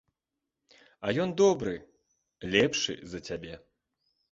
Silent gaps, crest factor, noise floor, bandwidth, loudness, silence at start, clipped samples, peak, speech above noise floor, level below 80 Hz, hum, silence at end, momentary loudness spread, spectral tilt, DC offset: none; 24 dB; -87 dBFS; 7.8 kHz; -29 LUFS; 1 s; under 0.1%; -8 dBFS; 58 dB; -60 dBFS; none; 0.75 s; 18 LU; -4 dB/octave; under 0.1%